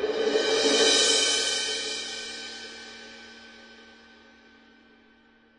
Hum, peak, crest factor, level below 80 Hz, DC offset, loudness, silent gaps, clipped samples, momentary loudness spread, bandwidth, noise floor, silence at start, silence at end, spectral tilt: none; -8 dBFS; 20 dB; -66 dBFS; under 0.1%; -23 LUFS; none; under 0.1%; 24 LU; 11 kHz; -59 dBFS; 0 s; 1.75 s; 0.5 dB/octave